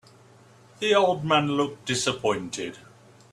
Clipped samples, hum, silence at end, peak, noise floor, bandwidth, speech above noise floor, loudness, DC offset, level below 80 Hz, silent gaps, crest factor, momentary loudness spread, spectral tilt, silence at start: under 0.1%; none; 0.55 s; -6 dBFS; -53 dBFS; 13 kHz; 29 dB; -24 LUFS; under 0.1%; -64 dBFS; none; 20 dB; 12 LU; -4 dB/octave; 0.8 s